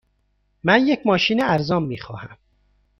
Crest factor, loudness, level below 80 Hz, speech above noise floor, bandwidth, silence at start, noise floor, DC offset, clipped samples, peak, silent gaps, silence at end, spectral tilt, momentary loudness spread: 20 dB; -19 LUFS; -54 dBFS; 47 dB; 11.5 kHz; 0.65 s; -67 dBFS; under 0.1%; under 0.1%; -2 dBFS; none; 0.65 s; -6 dB/octave; 16 LU